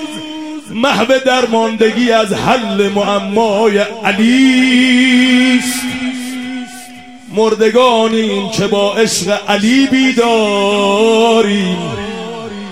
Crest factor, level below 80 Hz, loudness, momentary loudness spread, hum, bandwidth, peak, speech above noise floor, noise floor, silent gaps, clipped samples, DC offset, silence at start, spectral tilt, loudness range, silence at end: 12 dB; -50 dBFS; -12 LUFS; 14 LU; none; 16 kHz; 0 dBFS; 22 dB; -33 dBFS; none; under 0.1%; 0.6%; 0 s; -4 dB/octave; 3 LU; 0 s